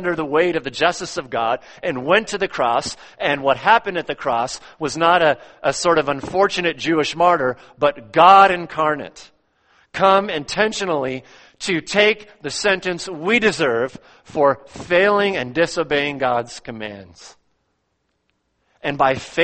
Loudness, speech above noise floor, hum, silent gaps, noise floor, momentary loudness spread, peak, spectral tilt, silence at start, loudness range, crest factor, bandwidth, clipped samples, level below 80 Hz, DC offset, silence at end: -18 LUFS; 52 dB; none; none; -70 dBFS; 12 LU; 0 dBFS; -4 dB/octave; 0 s; 5 LU; 20 dB; 8.8 kHz; under 0.1%; -54 dBFS; under 0.1%; 0 s